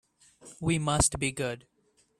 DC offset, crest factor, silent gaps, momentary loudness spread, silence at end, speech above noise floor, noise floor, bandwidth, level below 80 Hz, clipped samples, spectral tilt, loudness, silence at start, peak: under 0.1%; 20 dB; none; 10 LU; 0.6 s; 26 dB; -55 dBFS; 14.5 kHz; -48 dBFS; under 0.1%; -4 dB/octave; -28 LUFS; 0.45 s; -12 dBFS